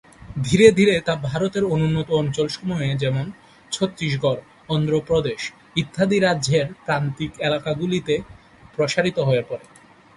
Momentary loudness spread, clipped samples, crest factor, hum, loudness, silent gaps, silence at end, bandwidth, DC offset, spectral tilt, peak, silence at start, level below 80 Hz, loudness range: 9 LU; under 0.1%; 22 dB; none; -21 LUFS; none; 0.6 s; 11.5 kHz; under 0.1%; -5.5 dB/octave; 0 dBFS; 0.2 s; -50 dBFS; 4 LU